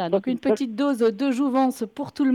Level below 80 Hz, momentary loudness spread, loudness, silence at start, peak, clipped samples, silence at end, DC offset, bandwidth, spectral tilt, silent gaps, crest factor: -68 dBFS; 4 LU; -23 LUFS; 0 s; -8 dBFS; under 0.1%; 0 s; under 0.1%; 13.5 kHz; -6 dB/octave; none; 14 dB